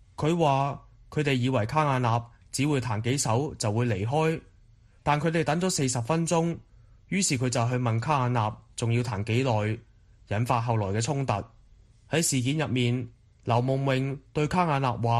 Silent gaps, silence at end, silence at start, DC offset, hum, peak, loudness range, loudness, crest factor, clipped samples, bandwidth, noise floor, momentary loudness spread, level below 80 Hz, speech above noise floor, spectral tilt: none; 0 s; 0.2 s; under 0.1%; none; -8 dBFS; 2 LU; -27 LUFS; 18 dB; under 0.1%; 13 kHz; -57 dBFS; 7 LU; -54 dBFS; 31 dB; -5.5 dB/octave